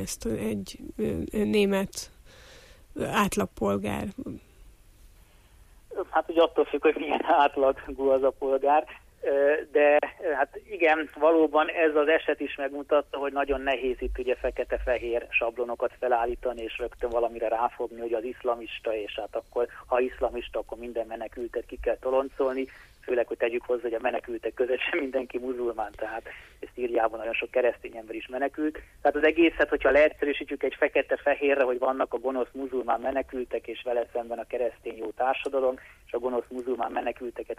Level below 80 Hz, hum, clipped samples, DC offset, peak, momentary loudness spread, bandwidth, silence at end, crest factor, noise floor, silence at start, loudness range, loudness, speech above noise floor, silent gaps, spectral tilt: -50 dBFS; none; under 0.1%; under 0.1%; -10 dBFS; 12 LU; 15 kHz; 0.05 s; 18 dB; -55 dBFS; 0 s; 7 LU; -27 LUFS; 28 dB; none; -5 dB/octave